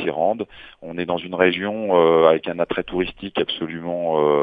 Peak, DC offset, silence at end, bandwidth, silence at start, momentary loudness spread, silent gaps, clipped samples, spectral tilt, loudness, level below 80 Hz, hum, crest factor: 0 dBFS; under 0.1%; 0 s; 4.9 kHz; 0 s; 13 LU; none; under 0.1%; -8.5 dB/octave; -20 LUFS; -52 dBFS; none; 20 dB